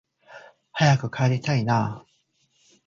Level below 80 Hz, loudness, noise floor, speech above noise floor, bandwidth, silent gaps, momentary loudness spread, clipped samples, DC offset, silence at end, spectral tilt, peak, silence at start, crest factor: -60 dBFS; -23 LUFS; -68 dBFS; 46 dB; 7.4 kHz; none; 13 LU; under 0.1%; under 0.1%; 0.85 s; -6 dB/octave; -6 dBFS; 0.3 s; 20 dB